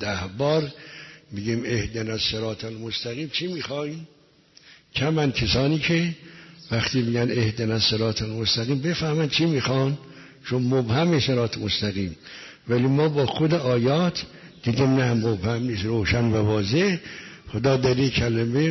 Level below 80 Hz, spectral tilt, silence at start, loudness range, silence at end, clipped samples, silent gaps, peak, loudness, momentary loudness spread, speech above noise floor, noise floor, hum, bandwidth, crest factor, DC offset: -48 dBFS; -6 dB/octave; 0 s; 5 LU; 0 s; under 0.1%; none; -8 dBFS; -24 LUFS; 12 LU; 32 dB; -55 dBFS; none; 6.2 kHz; 14 dB; under 0.1%